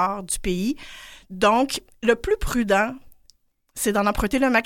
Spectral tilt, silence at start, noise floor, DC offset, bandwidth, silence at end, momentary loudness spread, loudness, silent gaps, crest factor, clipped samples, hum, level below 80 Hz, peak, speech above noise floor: -4 dB/octave; 0 s; -60 dBFS; under 0.1%; 17 kHz; 0 s; 20 LU; -22 LUFS; none; 20 dB; under 0.1%; none; -38 dBFS; -4 dBFS; 38 dB